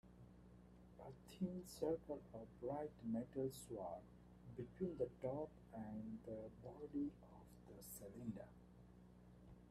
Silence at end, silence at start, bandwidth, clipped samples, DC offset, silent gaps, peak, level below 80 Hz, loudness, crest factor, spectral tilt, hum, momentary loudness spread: 0 s; 0.05 s; 14.5 kHz; under 0.1%; under 0.1%; none; -30 dBFS; -70 dBFS; -50 LUFS; 20 dB; -7 dB/octave; 60 Hz at -70 dBFS; 19 LU